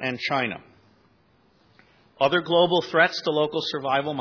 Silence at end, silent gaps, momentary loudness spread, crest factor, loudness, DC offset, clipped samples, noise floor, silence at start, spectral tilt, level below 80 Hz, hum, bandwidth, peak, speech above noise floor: 0 s; none; 7 LU; 18 dB; -23 LUFS; under 0.1%; under 0.1%; -61 dBFS; 0 s; -5 dB/octave; -68 dBFS; none; 5.4 kHz; -6 dBFS; 38 dB